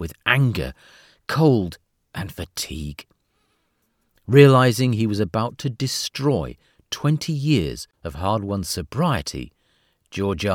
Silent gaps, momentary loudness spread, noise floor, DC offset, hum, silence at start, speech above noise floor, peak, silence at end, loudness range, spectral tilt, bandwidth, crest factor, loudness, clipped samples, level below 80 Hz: none; 18 LU; -69 dBFS; under 0.1%; none; 0 s; 48 dB; -2 dBFS; 0 s; 6 LU; -6 dB/octave; 16.5 kHz; 20 dB; -21 LUFS; under 0.1%; -44 dBFS